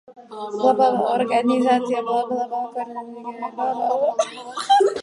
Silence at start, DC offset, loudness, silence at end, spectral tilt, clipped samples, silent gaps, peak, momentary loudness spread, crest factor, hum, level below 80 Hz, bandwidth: 0.1 s; under 0.1%; -21 LUFS; 0 s; -4 dB/octave; under 0.1%; none; -4 dBFS; 14 LU; 18 dB; none; -74 dBFS; 11.5 kHz